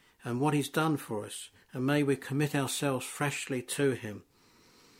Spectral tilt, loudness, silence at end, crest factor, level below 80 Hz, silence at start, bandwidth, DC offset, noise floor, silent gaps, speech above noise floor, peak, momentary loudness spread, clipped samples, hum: -5 dB/octave; -31 LUFS; 0.8 s; 18 dB; -70 dBFS; 0.25 s; 16.5 kHz; under 0.1%; -62 dBFS; none; 31 dB; -14 dBFS; 12 LU; under 0.1%; none